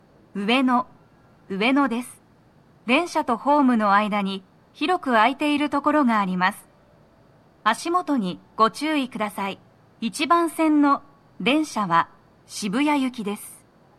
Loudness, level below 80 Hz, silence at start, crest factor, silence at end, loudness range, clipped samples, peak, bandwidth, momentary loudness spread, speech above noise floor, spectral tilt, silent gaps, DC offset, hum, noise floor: -22 LUFS; -68 dBFS; 0.35 s; 18 dB; 0.45 s; 4 LU; under 0.1%; -4 dBFS; 14 kHz; 13 LU; 34 dB; -4.5 dB/octave; none; under 0.1%; none; -55 dBFS